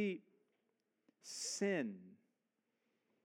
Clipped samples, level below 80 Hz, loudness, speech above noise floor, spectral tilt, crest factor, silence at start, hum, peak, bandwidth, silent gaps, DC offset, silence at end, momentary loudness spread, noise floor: under 0.1%; under -90 dBFS; -42 LUFS; 46 dB; -3.5 dB/octave; 20 dB; 0 s; none; -26 dBFS; 17 kHz; none; under 0.1%; 1.1 s; 18 LU; -87 dBFS